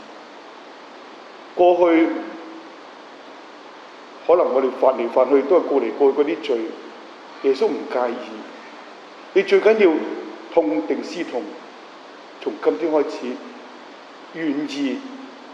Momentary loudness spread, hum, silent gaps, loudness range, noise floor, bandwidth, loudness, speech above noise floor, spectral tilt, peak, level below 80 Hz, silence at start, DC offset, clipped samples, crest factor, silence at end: 24 LU; none; none; 6 LU; -41 dBFS; 8 kHz; -20 LUFS; 22 dB; -5 dB/octave; -4 dBFS; -72 dBFS; 0 s; under 0.1%; under 0.1%; 18 dB; 0 s